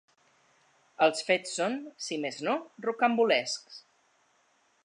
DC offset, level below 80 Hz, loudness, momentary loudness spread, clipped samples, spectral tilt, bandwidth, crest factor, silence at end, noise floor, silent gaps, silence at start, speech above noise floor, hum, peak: under 0.1%; -88 dBFS; -29 LUFS; 11 LU; under 0.1%; -3 dB/octave; 11 kHz; 20 dB; 1.05 s; -69 dBFS; none; 1 s; 40 dB; none; -12 dBFS